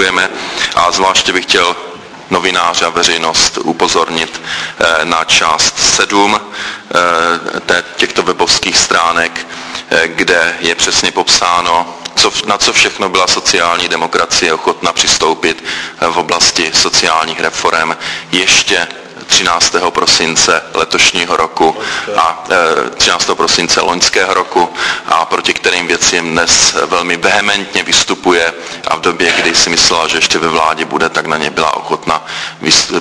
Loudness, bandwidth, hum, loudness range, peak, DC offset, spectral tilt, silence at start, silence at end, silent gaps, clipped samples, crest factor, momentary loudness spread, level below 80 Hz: -10 LUFS; 11 kHz; none; 1 LU; 0 dBFS; under 0.1%; -1 dB/octave; 0 s; 0 s; none; 0.3%; 12 dB; 7 LU; -42 dBFS